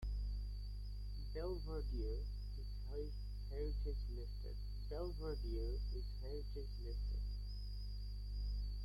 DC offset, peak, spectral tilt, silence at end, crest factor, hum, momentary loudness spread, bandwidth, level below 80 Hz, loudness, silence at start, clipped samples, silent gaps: under 0.1%; -32 dBFS; -7.5 dB/octave; 0 s; 10 dB; 50 Hz at -45 dBFS; 5 LU; 12 kHz; -44 dBFS; -47 LUFS; 0 s; under 0.1%; none